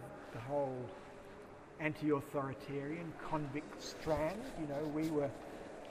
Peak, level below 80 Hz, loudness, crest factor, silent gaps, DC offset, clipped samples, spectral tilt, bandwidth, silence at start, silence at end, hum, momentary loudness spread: -22 dBFS; -62 dBFS; -41 LUFS; 20 dB; none; under 0.1%; under 0.1%; -6.5 dB/octave; 15.5 kHz; 0 s; 0 s; none; 14 LU